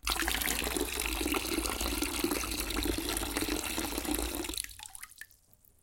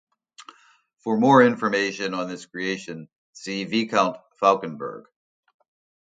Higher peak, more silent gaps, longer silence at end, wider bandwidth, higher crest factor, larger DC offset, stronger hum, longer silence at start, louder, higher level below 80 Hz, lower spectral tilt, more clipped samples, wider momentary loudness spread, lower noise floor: second, -12 dBFS vs -2 dBFS; second, none vs 3.18-3.33 s; second, 0.55 s vs 1.05 s; first, 17 kHz vs 9.2 kHz; about the same, 22 dB vs 22 dB; neither; neither; second, 0.05 s vs 0.4 s; second, -33 LUFS vs -22 LUFS; first, -44 dBFS vs -72 dBFS; second, -2.5 dB/octave vs -5 dB/octave; neither; second, 13 LU vs 19 LU; first, -63 dBFS vs -51 dBFS